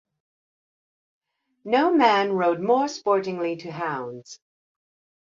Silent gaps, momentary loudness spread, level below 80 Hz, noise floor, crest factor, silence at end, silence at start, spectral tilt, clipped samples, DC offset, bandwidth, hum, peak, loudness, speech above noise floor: none; 15 LU; -74 dBFS; under -90 dBFS; 20 dB; 0.85 s; 1.65 s; -5 dB/octave; under 0.1%; under 0.1%; 7.6 kHz; none; -6 dBFS; -23 LUFS; over 68 dB